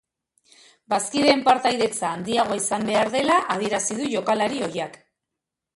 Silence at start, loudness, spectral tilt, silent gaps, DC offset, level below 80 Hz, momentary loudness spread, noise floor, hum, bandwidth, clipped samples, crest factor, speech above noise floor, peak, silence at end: 0.9 s; -22 LUFS; -3 dB/octave; none; under 0.1%; -64 dBFS; 9 LU; -85 dBFS; none; 11.5 kHz; under 0.1%; 20 dB; 63 dB; -4 dBFS; 0.85 s